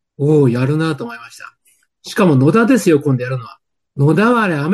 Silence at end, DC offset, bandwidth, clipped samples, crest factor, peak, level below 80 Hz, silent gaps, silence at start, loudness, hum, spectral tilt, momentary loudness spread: 0 s; under 0.1%; 12.5 kHz; under 0.1%; 14 dB; -2 dBFS; -58 dBFS; none; 0.2 s; -14 LUFS; none; -7 dB/octave; 15 LU